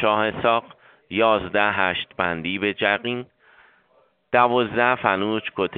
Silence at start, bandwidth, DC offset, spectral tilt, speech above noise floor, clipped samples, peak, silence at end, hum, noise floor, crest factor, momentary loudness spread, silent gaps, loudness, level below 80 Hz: 0 s; 4.7 kHz; under 0.1%; -2 dB/octave; 40 dB; under 0.1%; -2 dBFS; 0 s; none; -62 dBFS; 22 dB; 6 LU; none; -21 LUFS; -58 dBFS